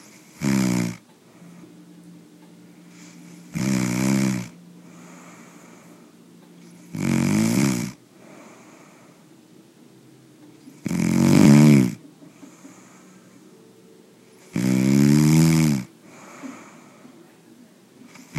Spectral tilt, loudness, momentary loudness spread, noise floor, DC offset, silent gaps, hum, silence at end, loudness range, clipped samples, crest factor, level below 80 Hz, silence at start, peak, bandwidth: -6 dB/octave; -19 LUFS; 26 LU; -51 dBFS; under 0.1%; none; none; 0 s; 11 LU; under 0.1%; 22 dB; -56 dBFS; 0.4 s; -2 dBFS; 15.5 kHz